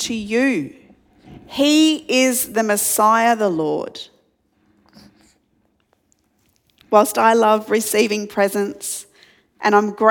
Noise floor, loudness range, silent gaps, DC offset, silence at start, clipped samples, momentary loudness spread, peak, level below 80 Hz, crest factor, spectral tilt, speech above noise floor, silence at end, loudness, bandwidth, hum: -64 dBFS; 7 LU; none; under 0.1%; 0 s; under 0.1%; 13 LU; 0 dBFS; -62 dBFS; 20 dB; -3 dB/octave; 47 dB; 0 s; -17 LUFS; 19 kHz; none